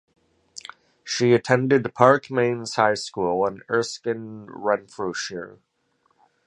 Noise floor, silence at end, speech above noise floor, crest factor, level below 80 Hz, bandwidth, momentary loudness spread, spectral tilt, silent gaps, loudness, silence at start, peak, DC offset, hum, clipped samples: -68 dBFS; 0.95 s; 46 dB; 24 dB; -64 dBFS; 11.5 kHz; 22 LU; -5 dB/octave; none; -22 LUFS; 0.55 s; 0 dBFS; under 0.1%; none; under 0.1%